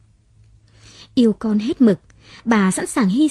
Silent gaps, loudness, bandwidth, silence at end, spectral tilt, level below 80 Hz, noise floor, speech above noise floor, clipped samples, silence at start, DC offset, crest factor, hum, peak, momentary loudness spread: none; -18 LUFS; 13.5 kHz; 0 s; -5.5 dB/octave; -54 dBFS; -52 dBFS; 36 dB; under 0.1%; 1.15 s; under 0.1%; 16 dB; none; -2 dBFS; 8 LU